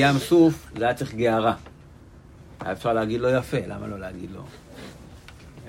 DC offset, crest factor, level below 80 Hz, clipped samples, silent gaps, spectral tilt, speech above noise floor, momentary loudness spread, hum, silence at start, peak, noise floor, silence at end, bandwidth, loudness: under 0.1%; 18 dB; -50 dBFS; under 0.1%; none; -6.5 dB/octave; 24 dB; 24 LU; none; 0 s; -6 dBFS; -47 dBFS; 0 s; 16 kHz; -23 LUFS